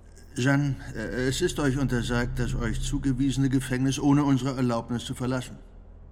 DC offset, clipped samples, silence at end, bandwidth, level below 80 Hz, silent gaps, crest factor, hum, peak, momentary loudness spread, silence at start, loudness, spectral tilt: under 0.1%; under 0.1%; 0 s; 15.5 kHz; -38 dBFS; none; 18 dB; none; -10 dBFS; 9 LU; 0.05 s; -27 LUFS; -6 dB/octave